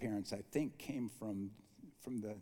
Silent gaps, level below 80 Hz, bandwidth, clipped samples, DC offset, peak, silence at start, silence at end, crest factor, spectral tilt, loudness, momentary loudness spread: none; -74 dBFS; 19 kHz; under 0.1%; under 0.1%; -24 dBFS; 0 s; 0 s; 20 dB; -6 dB/octave; -44 LUFS; 13 LU